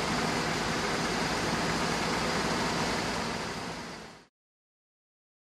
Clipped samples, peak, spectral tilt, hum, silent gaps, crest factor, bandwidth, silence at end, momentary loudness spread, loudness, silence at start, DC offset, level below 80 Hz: under 0.1%; -18 dBFS; -3.5 dB/octave; none; none; 16 dB; 15 kHz; 1.25 s; 9 LU; -30 LUFS; 0 s; under 0.1%; -50 dBFS